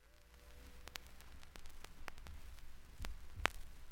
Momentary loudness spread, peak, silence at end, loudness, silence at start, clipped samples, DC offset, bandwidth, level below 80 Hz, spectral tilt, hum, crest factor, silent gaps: 20 LU; -10 dBFS; 0 s; -49 LUFS; 0 s; under 0.1%; under 0.1%; 17 kHz; -54 dBFS; -3 dB/octave; none; 38 dB; none